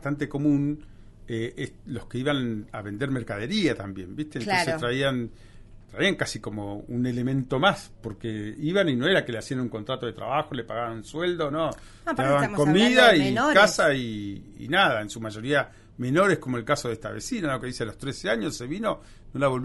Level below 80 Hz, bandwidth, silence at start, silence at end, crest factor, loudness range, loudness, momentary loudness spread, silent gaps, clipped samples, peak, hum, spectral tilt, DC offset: -50 dBFS; 11.5 kHz; 0 s; 0 s; 22 dB; 8 LU; -25 LUFS; 15 LU; none; under 0.1%; -4 dBFS; none; -5 dB/octave; under 0.1%